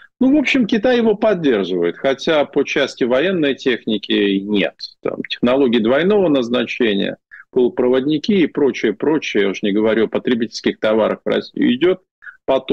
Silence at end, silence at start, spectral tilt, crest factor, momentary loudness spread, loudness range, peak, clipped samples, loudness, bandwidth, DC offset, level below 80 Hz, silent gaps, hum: 0 s; 0.2 s; -6 dB/octave; 10 dB; 6 LU; 1 LU; -6 dBFS; under 0.1%; -17 LUFS; 8 kHz; under 0.1%; -54 dBFS; 12.11-12.22 s; none